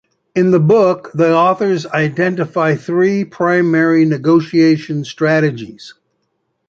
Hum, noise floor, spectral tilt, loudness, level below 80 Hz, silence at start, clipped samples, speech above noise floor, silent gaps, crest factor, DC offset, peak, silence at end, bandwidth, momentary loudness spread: none; -68 dBFS; -7.5 dB/octave; -14 LUFS; -60 dBFS; 0.35 s; under 0.1%; 55 dB; none; 12 dB; under 0.1%; -2 dBFS; 0.75 s; 7.4 kHz; 6 LU